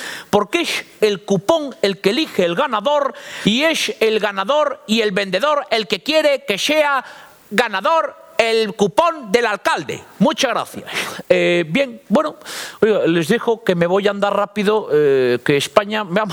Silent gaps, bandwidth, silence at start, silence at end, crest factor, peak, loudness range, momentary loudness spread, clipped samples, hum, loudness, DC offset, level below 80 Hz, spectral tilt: none; over 20 kHz; 0 s; 0 s; 18 dB; 0 dBFS; 1 LU; 5 LU; under 0.1%; none; -17 LUFS; under 0.1%; -60 dBFS; -4.5 dB/octave